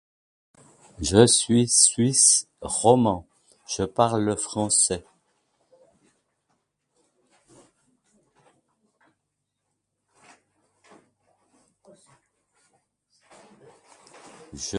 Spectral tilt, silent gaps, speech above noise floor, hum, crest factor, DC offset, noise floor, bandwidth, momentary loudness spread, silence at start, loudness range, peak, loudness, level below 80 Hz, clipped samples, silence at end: -3.5 dB/octave; none; 59 dB; none; 26 dB; under 0.1%; -80 dBFS; 11.5 kHz; 16 LU; 1 s; 9 LU; -2 dBFS; -20 LUFS; -54 dBFS; under 0.1%; 0 s